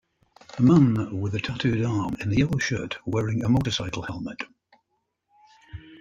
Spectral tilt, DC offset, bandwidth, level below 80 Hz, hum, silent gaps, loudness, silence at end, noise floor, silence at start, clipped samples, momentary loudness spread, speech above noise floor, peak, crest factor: -6.5 dB/octave; under 0.1%; 8.6 kHz; -50 dBFS; none; none; -24 LUFS; 0.05 s; -76 dBFS; 0.55 s; under 0.1%; 19 LU; 53 dB; -8 dBFS; 18 dB